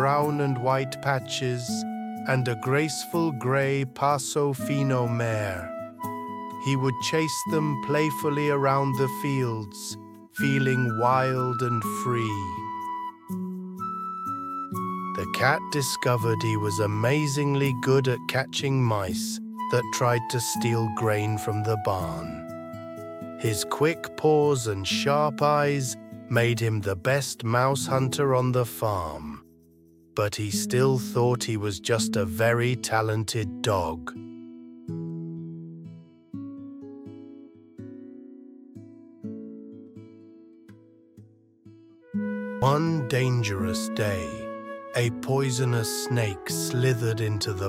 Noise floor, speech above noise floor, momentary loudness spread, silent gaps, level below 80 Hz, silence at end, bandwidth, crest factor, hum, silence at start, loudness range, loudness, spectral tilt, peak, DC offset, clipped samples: -56 dBFS; 31 dB; 16 LU; none; -58 dBFS; 0 s; 16.5 kHz; 20 dB; none; 0 s; 15 LU; -26 LUFS; -5 dB/octave; -6 dBFS; under 0.1%; under 0.1%